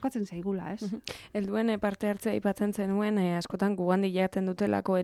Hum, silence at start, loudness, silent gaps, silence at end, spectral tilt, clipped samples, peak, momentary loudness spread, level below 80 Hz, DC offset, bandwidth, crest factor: none; 0 s; -30 LUFS; none; 0 s; -7 dB/octave; under 0.1%; -12 dBFS; 8 LU; -62 dBFS; under 0.1%; 13.5 kHz; 16 dB